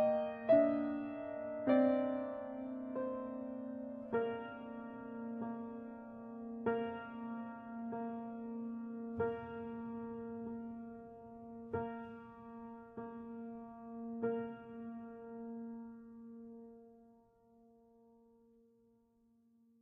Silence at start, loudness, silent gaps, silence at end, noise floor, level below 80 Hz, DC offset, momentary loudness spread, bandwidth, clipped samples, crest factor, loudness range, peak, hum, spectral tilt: 0 s; -41 LUFS; none; 2.65 s; -72 dBFS; -76 dBFS; under 0.1%; 18 LU; 4.7 kHz; under 0.1%; 22 dB; 14 LU; -18 dBFS; none; -6.5 dB/octave